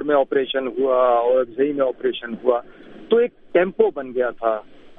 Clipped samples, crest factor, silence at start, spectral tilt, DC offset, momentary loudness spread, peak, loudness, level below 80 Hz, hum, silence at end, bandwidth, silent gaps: under 0.1%; 18 dB; 0 s; -8.5 dB/octave; under 0.1%; 7 LU; -4 dBFS; -21 LUFS; -56 dBFS; none; 0.05 s; 3.9 kHz; none